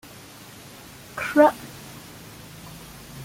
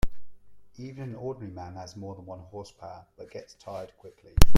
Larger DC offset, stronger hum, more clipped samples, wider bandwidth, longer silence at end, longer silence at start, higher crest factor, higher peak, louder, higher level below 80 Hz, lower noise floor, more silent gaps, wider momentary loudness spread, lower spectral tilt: neither; neither; neither; about the same, 16.5 kHz vs 15.5 kHz; about the same, 0 s vs 0 s; first, 1.15 s vs 0.05 s; about the same, 22 dB vs 22 dB; second, -4 dBFS vs 0 dBFS; first, -20 LUFS vs -38 LUFS; second, -56 dBFS vs -34 dBFS; about the same, -44 dBFS vs -45 dBFS; neither; first, 24 LU vs 9 LU; about the same, -5 dB/octave vs -5 dB/octave